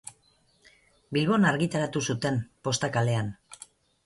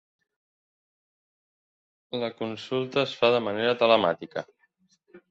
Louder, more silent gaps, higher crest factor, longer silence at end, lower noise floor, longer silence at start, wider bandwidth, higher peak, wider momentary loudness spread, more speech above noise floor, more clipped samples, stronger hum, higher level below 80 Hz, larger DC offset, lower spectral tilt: about the same, -27 LUFS vs -25 LUFS; neither; second, 18 dB vs 24 dB; first, 0.5 s vs 0.15 s; about the same, -65 dBFS vs -68 dBFS; second, 0.05 s vs 2.15 s; first, 11.5 kHz vs 7.8 kHz; second, -10 dBFS vs -6 dBFS; first, 22 LU vs 15 LU; second, 39 dB vs 43 dB; neither; neither; first, -62 dBFS vs -72 dBFS; neither; about the same, -5 dB/octave vs -5.5 dB/octave